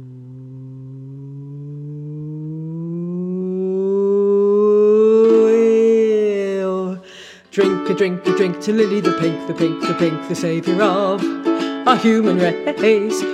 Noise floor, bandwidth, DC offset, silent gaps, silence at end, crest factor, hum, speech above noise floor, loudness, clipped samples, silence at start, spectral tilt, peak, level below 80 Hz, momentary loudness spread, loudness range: -40 dBFS; 11.5 kHz; under 0.1%; none; 0 s; 16 dB; none; 23 dB; -17 LUFS; under 0.1%; 0 s; -6.5 dB/octave; 0 dBFS; -68 dBFS; 20 LU; 10 LU